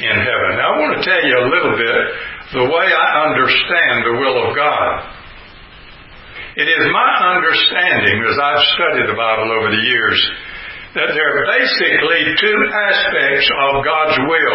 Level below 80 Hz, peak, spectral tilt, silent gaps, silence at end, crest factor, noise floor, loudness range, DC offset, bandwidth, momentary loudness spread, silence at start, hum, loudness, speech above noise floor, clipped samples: -46 dBFS; 0 dBFS; -7.5 dB/octave; none; 0 s; 14 dB; -38 dBFS; 3 LU; under 0.1%; 5.8 kHz; 7 LU; 0 s; none; -13 LUFS; 24 dB; under 0.1%